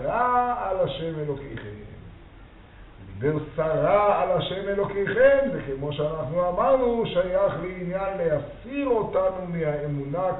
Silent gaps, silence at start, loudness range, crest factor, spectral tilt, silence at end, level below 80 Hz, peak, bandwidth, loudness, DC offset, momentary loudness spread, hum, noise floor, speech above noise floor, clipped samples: none; 0 s; 6 LU; 18 dB; -5 dB/octave; 0 s; -46 dBFS; -6 dBFS; 4.1 kHz; -25 LUFS; under 0.1%; 11 LU; none; -47 dBFS; 23 dB; under 0.1%